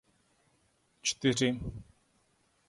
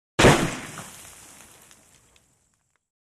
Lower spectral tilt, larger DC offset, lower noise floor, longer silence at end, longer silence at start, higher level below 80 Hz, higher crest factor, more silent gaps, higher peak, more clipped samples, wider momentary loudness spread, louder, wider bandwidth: about the same, -4 dB/octave vs -4.5 dB/octave; neither; about the same, -72 dBFS vs -70 dBFS; second, 0.85 s vs 2.25 s; first, 1.05 s vs 0.2 s; second, -56 dBFS vs -42 dBFS; about the same, 22 dB vs 22 dB; neither; second, -14 dBFS vs -4 dBFS; neither; second, 15 LU vs 28 LU; second, -31 LUFS vs -20 LUFS; second, 11.5 kHz vs 15.5 kHz